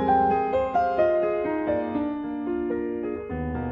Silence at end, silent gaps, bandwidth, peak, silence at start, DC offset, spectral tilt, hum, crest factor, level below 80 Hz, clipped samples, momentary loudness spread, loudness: 0 s; none; 6.8 kHz; -10 dBFS; 0 s; under 0.1%; -9 dB/octave; none; 16 dB; -46 dBFS; under 0.1%; 9 LU; -25 LUFS